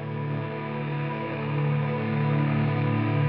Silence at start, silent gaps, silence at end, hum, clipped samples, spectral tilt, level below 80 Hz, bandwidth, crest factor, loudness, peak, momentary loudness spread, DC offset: 0 s; none; 0 s; none; under 0.1%; -7 dB/octave; -62 dBFS; 5 kHz; 12 dB; -27 LUFS; -14 dBFS; 6 LU; 0.1%